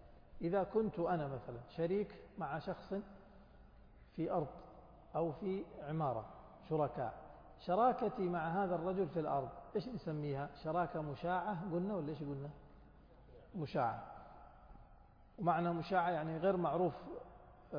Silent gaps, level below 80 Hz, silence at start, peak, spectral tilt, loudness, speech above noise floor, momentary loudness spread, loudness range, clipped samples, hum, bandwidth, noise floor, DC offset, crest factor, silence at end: none; -64 dBFS; 0 s; -22 dBFS; -6.5 dB/octave; -40 LUFS; 24 dB; 16 LU; 6 LU; under 0.1%; none; 5.2 kHz; -62 dBFS; under 0.1%; 18 dB; 0 s